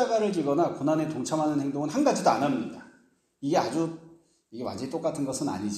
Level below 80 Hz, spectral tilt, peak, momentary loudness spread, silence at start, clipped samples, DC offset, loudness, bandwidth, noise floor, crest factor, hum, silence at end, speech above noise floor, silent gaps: -70 dBFS; -5.5 dB/octave; -8 dBFS; 12 LU; 0 s; under 0.1%; under 0.1%; -28 LUFS; 13.5 kHz; -63 dBFS; 20 dB; none; 0 s; 36 dB; none